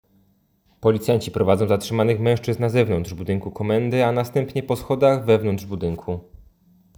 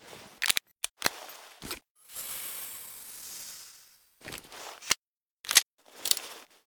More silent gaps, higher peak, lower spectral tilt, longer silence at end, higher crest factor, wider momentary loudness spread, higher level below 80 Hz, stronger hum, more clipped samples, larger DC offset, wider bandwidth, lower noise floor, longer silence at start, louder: second, none vs 0.91-0.95 s, 1.90-1.95 s, 4.98-5.44 s, 5.62-5.77 s; about the same, -2 dBFS vs 0 dBFS; first, -7 dB/octave vs 1.5 dB/octave; first, 0.75 s vs 0.25 s; second, 18 dB vs 34 dB; second, 8 LU vs 22 LU; first, -48 dBFS vs -66 dBFS; neither; neither; neither; about the same, over 20 kHz vs over 20 kHz; second, -62 dBFS vs -66 dBFS; first, 0.8 s vs 0 s; first, -21 LUFS vs -30 LUFS